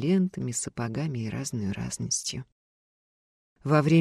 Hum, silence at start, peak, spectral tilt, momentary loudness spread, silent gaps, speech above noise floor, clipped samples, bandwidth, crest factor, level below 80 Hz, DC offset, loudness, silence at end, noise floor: none; 0 s; -10 dBFS; -5 dB/octave; 8 LU; 2.52-3.56 s; over 63 dB; under 0.1%; 14 kHz; 18 dB; -58 dBFS; under 0.1%; -29 LUFS; 0 s; under -90 dBFS